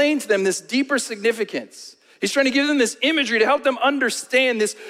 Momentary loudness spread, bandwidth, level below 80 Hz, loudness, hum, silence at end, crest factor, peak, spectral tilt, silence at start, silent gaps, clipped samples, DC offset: 9 LU; 16 kHz; -68 dBFS; -20 LUFS; none; 0 s; 18 dB; -4 dBFS; -2.5 dB/octave; 0 s; none; under 0.1%; under 0.1%